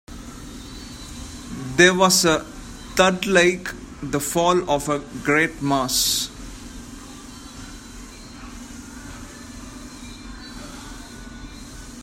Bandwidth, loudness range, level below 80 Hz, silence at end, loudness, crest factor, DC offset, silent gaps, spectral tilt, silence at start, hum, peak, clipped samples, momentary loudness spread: 16 kHz; 19 LU; -42 dBFS; 0 s; -19 LUFS; 24 dB; under 0.1%; none; -3 dB/octave; 0.1 s; none; 0 dBFS; under 0.1%; 22 LU